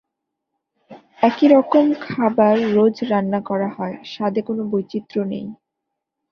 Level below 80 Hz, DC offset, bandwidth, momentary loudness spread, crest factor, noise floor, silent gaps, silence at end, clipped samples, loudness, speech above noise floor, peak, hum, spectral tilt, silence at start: -64 dBFS; under 0.1%; 6.6 kHz; 12 LU; 18 dB; -80 dBFS; none; 0.75 s; under 0.1%; -19 LUFS; 62 dB; -2 dBFS; none; -8 dB/octave; 0.9 s